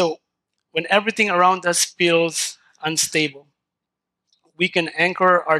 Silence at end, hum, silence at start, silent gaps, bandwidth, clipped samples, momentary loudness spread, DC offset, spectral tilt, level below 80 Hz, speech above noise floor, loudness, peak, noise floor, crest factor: 0 s; none; 0 s; none; 15 kHz; under 0.1%; 10 LU; under 0.1%; -2.5 dB/octave; -72 dBFS; 64 dB; -19 LUFS; -4 dBFS; -83 dBFS; 18 dB